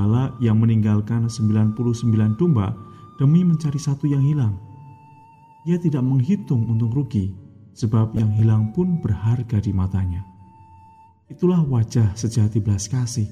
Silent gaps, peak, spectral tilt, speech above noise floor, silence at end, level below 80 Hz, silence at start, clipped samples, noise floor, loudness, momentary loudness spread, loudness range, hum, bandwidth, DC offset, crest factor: none; -8 dBFS; -8 dB/octave; 30 dB; 0 s; -48 dBFS; 0 s; under 0.1%; -49 dBFS; -20 LUFS; 7 LU; 3 LU; none; 11 kHz; under 0.1%; 12 dB